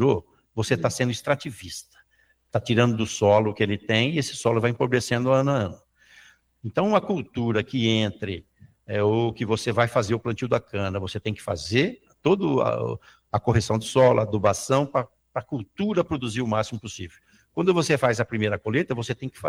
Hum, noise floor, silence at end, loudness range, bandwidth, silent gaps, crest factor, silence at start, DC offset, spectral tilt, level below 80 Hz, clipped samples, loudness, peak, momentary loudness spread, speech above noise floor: none; -65 dBFS; 0 s; 3 LU; 15 kHz; none; 20 dB; 0 s; under 0.1%; -5.5 dB/octave; -54 dBFS; under 0.1%; -24 LUFS; -4 dBFS; 12 LU; 41 dB